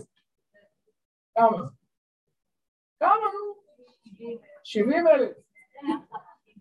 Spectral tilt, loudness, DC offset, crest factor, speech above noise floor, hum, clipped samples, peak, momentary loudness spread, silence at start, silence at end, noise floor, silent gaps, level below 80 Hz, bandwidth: -6.5 dB/octave; -25 LUFS; under 0.1%; 22 dB; 42 dB; none; under 0.1%; -6 dBFS; 20 LU; 1.35 s; 0.4 s; -65 dBFS; 1.98-2.27 s, 2.68-2.96 s; -76 dBFS; 10 kHz